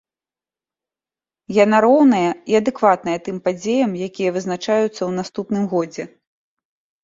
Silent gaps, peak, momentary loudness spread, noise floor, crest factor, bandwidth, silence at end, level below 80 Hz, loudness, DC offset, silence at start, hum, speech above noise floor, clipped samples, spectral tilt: none; -2 dBFS; 11 LU; under -90 dBFS; 18 dB; 7.8 kHz; 0.95 s; -62 dBFS; -18 LUFS; under 0.1%; 1.5 s; none; over 72 dB; under 0.1%; -6 dB/octave